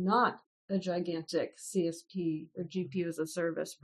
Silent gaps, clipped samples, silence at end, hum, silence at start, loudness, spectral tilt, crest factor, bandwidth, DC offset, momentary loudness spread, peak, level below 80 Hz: 0.46-0.68 s; under 0.1%; 0.1 s; none; 0 s; -35 LUFS; -5.5 dB/octave; 18 dB; 12.5 kHz; under 0.1%; 6 LU; -16 dBFS; -78 dBFS